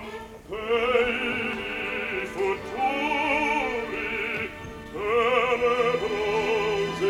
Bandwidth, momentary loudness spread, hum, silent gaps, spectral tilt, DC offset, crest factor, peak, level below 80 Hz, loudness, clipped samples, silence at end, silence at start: 15.5 kHz; 11 LU; none; none; -4.5 dB/octave; under 0.1%; 18 dB; -8 dBFS; -50 dBFS; -25 LUFS; under 0.1%; 0 s; 0 s